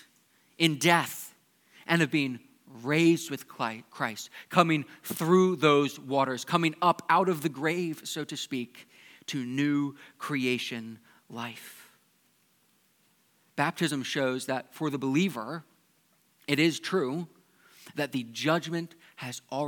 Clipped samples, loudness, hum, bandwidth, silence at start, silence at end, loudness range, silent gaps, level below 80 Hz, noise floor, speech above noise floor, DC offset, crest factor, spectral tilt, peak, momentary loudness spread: under 0.1%; -28 LUFS; none; 19 kHz; 0.6 s; 0 s; 8 LU; none; -84 dBFS; -68 dBFS; 40 dB; under 0.1%; 26 dB; -5 dB/octave; -4 dBFS; 17 LU